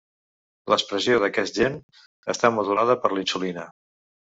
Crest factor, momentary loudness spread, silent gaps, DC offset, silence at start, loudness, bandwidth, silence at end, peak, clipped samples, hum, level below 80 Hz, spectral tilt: 22 dB; 16 LU; 1.83-1.89 s, 2.06-2.23 s; under 0.1%; 0.65 s; -23 LUFS; 8 kHz; 0.65 s; -2 dBFS; under 0.1%; none; -60 dBFS; -2.5 dB/octave